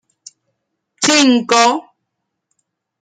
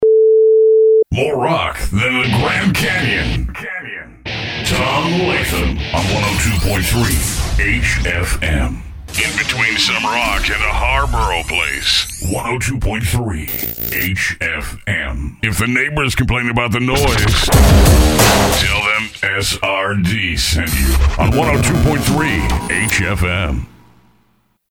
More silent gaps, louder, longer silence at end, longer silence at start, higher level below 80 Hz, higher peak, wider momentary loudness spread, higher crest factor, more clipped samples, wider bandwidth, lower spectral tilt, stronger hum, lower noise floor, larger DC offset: neither; about the same, -13 LUFS vs -15 LUFS; first, 1.2 s vs 1 s; first, 1 s vs 0 s; second, -68 dBFS vs -22 dBFS; about the same, 0 dBFS vs 0 dBFS; second, 7 LU vs 10 LU; about the same, 18 dB vs 14 dB; neither; second, 10 kHz vs over 20 kHz; second, -1.5 dB/octave vs -4 dB/octave; neither; first, -75 dBFS vs -59 dBFS; neither